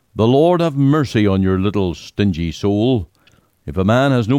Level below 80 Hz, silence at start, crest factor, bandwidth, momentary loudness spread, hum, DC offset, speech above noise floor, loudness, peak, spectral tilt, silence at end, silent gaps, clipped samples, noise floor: -40 dBFS; 0.15 s; 12 dB; 13.5 kHz; 8 LU; none; under 0.1%; 40 dB; -16 LUFS; -4 dBFS; -7.5 dB/octave; 0 s; none; under 0.1%; -55 dBFS